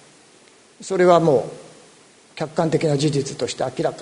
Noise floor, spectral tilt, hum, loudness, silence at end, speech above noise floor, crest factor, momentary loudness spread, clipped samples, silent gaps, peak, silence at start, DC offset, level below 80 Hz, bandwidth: -51 dBFS; -6 dB/octave; none; -20 LUFS; 0 s; 32 dB; 20 dB; 21 LU; under 0.1%; none; 0 dBFS; 0.8 s; under 0.1%; -60 dBFS; 11 kHz